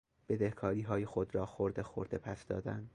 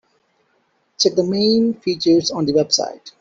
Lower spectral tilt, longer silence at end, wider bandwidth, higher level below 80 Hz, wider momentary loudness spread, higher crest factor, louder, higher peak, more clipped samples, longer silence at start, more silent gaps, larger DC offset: first, -8.5 dB/octave vs -4.5 dB/octave; about the same, 0.05 s vs 0.1 s; first, 10.5 kHz vs 7.8 kHz; about the same, -58 dBFS vs -60 dBFS; about the same, 6 LU vs 4 LU; about the same, 18 dB vs 16 dB; second, -38 LUFS vs -17 LUFS; second, -20 dBFS vs -4 dBFS; neither; second, 0.3 s vs 1 s; neither; neither